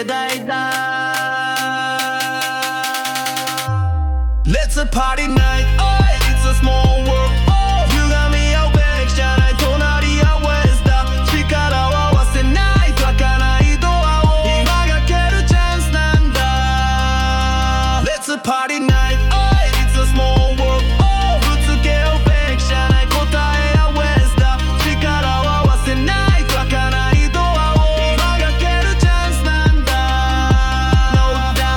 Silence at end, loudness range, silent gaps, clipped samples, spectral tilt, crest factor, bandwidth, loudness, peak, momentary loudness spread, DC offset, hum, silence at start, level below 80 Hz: 0 s; 3 LU; none; under 0.1%; -5 dB/octave; 14 dB; 18 kHz; -15 LUFS; 0 dBFS; 4 LU; under 0.1%; none; 0 s; -16 dBFS